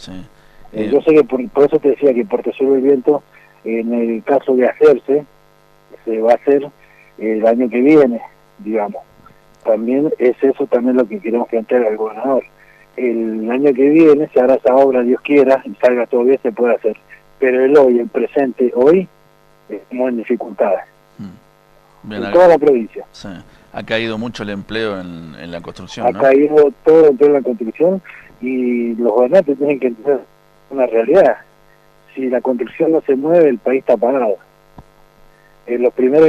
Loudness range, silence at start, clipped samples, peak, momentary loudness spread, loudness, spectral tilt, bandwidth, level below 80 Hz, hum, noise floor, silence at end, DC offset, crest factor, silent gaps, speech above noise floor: 4 LU; 0 s; under 0.1%; -2 dBFS; 18 LU; -14 LUFS; -7.5 dB/octave; 7.6 kHz; -52 dBFS; none; -50 dBFS; 0 s; under 0.1%; 12 dB; none; 36 dB